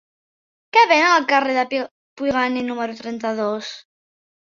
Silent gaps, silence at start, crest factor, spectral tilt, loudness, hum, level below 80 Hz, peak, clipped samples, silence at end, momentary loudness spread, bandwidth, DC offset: 1.91-2.16 s; 0.75 s; 20 dB; -3 dB/octave; -19 LUFS; none; -62 dBFS; -2 dBFS; under 0.1%; 0.7 s; 15 LU; 7.4 kHz; under 0.1%